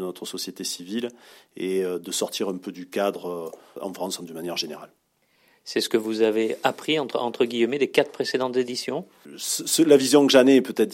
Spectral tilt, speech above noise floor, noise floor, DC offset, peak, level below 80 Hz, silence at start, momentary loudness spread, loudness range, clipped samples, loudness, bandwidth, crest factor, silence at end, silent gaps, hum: -3.5 dB/octave; 41 dB; -64 dBFS; under 0.1%; -4 dBFS; -76 dBFS; 0 s; 17 LU; 10 LU; under 0.1%; -23 LUFS; 16.5 kHz; 20 dB; 0 s; none; none